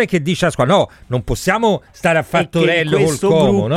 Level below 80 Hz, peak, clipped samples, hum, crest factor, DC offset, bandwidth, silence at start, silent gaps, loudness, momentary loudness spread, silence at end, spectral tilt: -38 dBFS; -2 dBFS; under 0.1%; none; 14 dB; under 0.1%; 16 kHz; 0 s; none; -15 LUFS; 5 LU; 0 s; -5.5 dB/octave